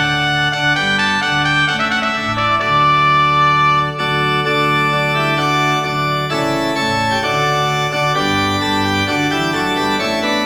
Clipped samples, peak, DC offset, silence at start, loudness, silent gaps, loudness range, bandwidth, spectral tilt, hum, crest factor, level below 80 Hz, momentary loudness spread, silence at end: under 0.1%; -4 dBFS; under 0.1%; 0 s; -15 LUFS; none; 2 LU; 19.5 kHz; -4 dB/octave; none; 12 dB; -42 dBFS; 5 LU; 0 s